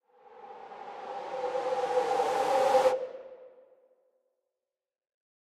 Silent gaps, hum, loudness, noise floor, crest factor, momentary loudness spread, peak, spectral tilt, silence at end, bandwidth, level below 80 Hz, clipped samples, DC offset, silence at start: none; none; -29 LUFS; under -90 dBFS; 20 dB; 22 LU; -12 dBFS; -3 dB/octave; 2.1 s; 14 kHz; -80 dBFS; under 0.1%; under 0.1%; 0.3 s